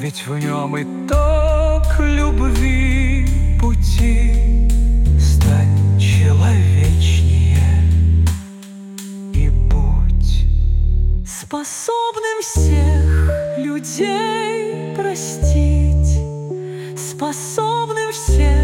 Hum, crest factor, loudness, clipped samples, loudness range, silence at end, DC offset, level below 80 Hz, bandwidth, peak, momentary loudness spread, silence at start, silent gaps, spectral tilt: none; 10 dB; -17 LUFS; under 0.1%; 5 LU; 0 s; under 0.1%; -18 dBFS; 15.5 kHz; -4 dBFS; 10 LU; 0 s; none; -6 dB/octave